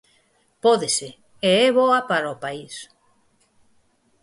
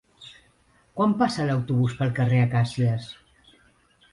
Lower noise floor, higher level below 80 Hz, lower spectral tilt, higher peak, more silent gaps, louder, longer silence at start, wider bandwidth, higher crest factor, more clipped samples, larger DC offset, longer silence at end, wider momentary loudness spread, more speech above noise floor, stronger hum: about the same, -63 dBFS vs -61 dBFS; second, -68 dBFS vs -56 dBFS; second, -3 dB/octave vs -7.5 dB/octave; first, -6 dBFS vs -10 dBFS; neither; first, -20 LUFS vs -24 LUFS; first, 0.65 s vs 0.2 s; about the same, 11.5 kHz vs 11 kHz; about the same, 18 dB vs 16 dB; neither; neither; first, 1.4 s vs 1 s; second, 19 LU vs 22 LU; first, 43 dB vs 39 dB; neither